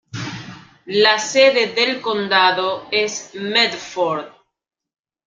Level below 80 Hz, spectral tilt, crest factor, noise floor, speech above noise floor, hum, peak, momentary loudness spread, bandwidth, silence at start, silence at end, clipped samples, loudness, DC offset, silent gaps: -64 dBFS; -2.5 dB/octave; 18 dB; -38 dBFS; 21 dB; none; 0 dBFS; 15 LU; 9.2 kHz; 0.15 s; 1 s; under 0.1%; -17 LUFS; under 0.1%; none